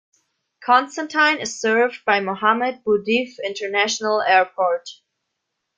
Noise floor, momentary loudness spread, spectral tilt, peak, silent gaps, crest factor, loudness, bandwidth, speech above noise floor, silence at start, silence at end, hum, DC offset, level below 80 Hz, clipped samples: -78 dBFS; 9 LU; -2.5 dB/octave; -2 dBFS; none; 20 dB; -19 LUFS; 9.4 kHz; 58 dB; 0.6 s; 0.85 s; none; under 0.1%; -68 dBFS; under 0.1%